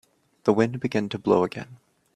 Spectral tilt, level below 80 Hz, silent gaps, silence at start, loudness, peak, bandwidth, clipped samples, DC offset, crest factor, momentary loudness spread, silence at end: -7 dB/octave; -64 dBFS; none; 0.45 s; -24 LUFS; -4 dBFS; 11 kHz; under 0.1%; under 0.1%; 20 dB; 12 LU; 0.4 s